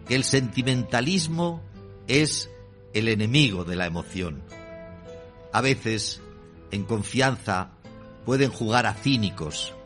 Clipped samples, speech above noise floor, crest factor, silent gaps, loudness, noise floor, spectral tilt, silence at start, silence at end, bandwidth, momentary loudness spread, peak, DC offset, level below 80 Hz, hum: under 0.1%; 20 dB; 20 dB; none; -25 LUFS; -45 dBFS; -4.5 dB/octave; 0 s; 0 s; 11.5 kHz; 20 LU; -6 dBFS; under 0.1%; -52 dBFS; none